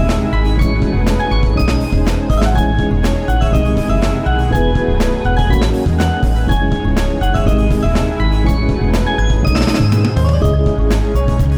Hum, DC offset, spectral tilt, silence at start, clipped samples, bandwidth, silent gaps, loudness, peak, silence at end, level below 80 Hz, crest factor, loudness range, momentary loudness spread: none; under 0.1%; -7 dB/octave; 0 s; under 0.1%; 13.5 kHz; none; -15 LUFS; -2 dBFS; 0 s; -16 dBFS; 12 dB; 1 LU; 2 LU